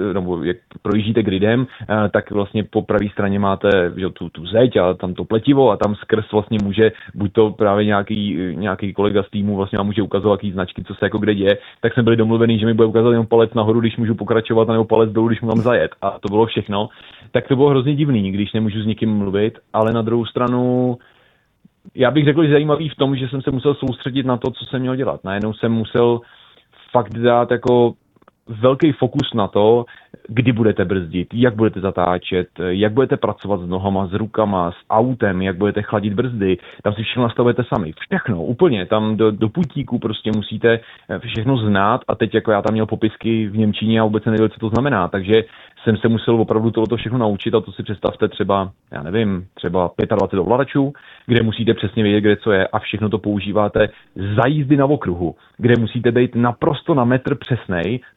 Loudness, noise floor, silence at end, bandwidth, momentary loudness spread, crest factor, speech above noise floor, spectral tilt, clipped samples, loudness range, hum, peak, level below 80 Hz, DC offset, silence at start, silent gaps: -18 LUFS; -57 dBFS; 0.15 s; 5.8 kHz; 7 LU; 16 dB; 40 dB; -9 dB/octave; under 0.1%; 3 LU; none; 0 dBFS; -48 dBFS; under 0.1%; 0 s; none